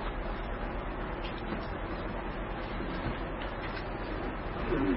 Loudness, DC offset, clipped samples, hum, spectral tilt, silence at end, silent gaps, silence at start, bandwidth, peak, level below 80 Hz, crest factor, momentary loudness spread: -37 LUFS; under 0.1%; under 0.1%; none; -5 dB/octave; 0 s; none; 0 s; 5.6 kHz; -18 dBFS; -40 dBFS; 16 dB; 2 LU